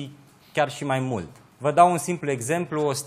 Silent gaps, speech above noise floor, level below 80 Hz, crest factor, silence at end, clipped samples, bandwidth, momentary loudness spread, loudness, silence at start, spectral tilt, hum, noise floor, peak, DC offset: none; 22 dB; -64 dBFS; 20 dB; 0 s; under 0.1%; 15.5 kHz; 13 LU; -24 LUFS; 0 s; -5 dB/octave; none; -45 dBFS; -4 dBFS; under 0.1%